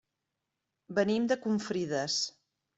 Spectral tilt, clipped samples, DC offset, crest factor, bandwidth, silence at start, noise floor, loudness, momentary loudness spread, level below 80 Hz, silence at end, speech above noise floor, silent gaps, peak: -4 dB/octave; under 0.1%; under 0.1%; 18 dB; 8.2 kHz; 0.9 s; -86 dBFS; -31 LUFS; 5 LU; -74 dBFS; 0.45 s; 55 dB; none; -16 dBFS